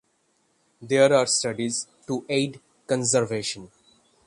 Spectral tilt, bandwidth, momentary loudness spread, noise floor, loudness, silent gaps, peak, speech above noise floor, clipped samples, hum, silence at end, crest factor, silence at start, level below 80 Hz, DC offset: -3.5 dB/octave; 11.5 kHz; 13 LU; -68 dBFS; -24 LUFS; none; -6 dBFS; 45 dB; under 0.1%; none; 0.6 s; 20 dB; 0.8 s; -66 dBFS; under 0.1%